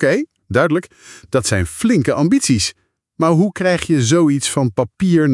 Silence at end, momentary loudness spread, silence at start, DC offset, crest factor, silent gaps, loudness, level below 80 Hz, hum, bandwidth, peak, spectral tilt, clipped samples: 0 s; 6 LU; 0 s; under 0.1%; 16 dB; none; -16 LUFS; -48 dBFS; none; 12 kHz; 0 dBFS; -5 dB/octave; under 0.1%